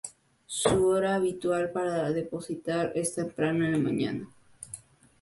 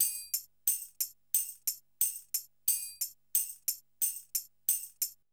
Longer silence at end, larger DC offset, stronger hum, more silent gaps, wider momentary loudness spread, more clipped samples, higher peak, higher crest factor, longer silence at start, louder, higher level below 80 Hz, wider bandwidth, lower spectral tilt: first, 0.4 s vs 0.2 s; neither; neither; neither; first, 18 LU vs 6 LU; neither; first, -8 dBFS vs -12 dBFS; about the same, 20 dB vs 22 dB; about the same, 0.05 s vs 0 s; first, -28 LUFS vs -32 LUFS; first, -58 dBFS vs -76 dBFS; second, 11.5 kHz vs over 20 kHz; first, -5 dB/octave vs 3.5 dB/octave